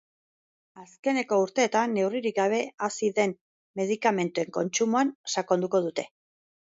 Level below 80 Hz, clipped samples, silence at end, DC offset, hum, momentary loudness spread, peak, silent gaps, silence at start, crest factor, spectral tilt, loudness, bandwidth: -78 dBFS; under 0.1%; 0.7 s; under 0.1%; none; 8 LU; -8 dBFS; 0.99-1.03 s, 3.41-3.74 s, 5.15-5.24 s; 0.75 s; 20 dB; -4 dB/octave; -27 LUFS; 8 kHz